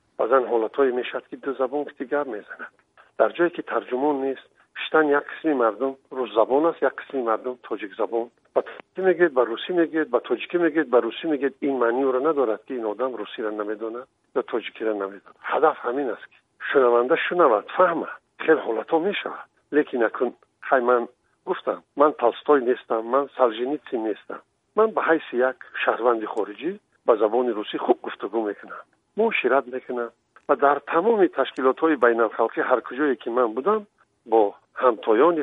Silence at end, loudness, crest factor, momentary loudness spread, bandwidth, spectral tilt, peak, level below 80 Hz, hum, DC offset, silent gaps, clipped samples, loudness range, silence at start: 0 s; -23 LUFS; 20 dB; 12 LU; 4 kHz; -7.5 dB/octave; -4 dBFS; -78 dBFS; none; under 0.1%; none; under 0.1%; 4 LU; 0.2 s